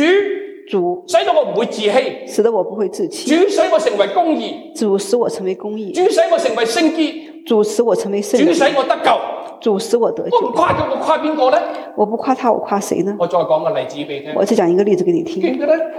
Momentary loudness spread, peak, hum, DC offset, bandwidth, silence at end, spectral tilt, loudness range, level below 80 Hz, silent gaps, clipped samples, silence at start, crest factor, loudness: 8 LU; 0 dBFS; none; under 0.1%; 15.5 kHz; 0 s; -4.5 dB/octave; 2 LU; -60 dBFS; none; under 0.1%; 0 s; 14 dB; -16 LUFS